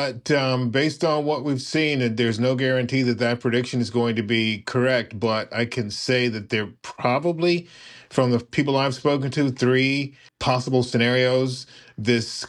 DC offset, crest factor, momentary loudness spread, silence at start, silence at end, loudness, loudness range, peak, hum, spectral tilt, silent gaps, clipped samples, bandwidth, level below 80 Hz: under 0.1%; 16 dB; 6 LU; 0 s; 0 s; -22 LUFS; 2 LU; -6 dBFS; none; -5.5 dB/octave; none; under 0.1%; 11.5 kHz; -62 dBFS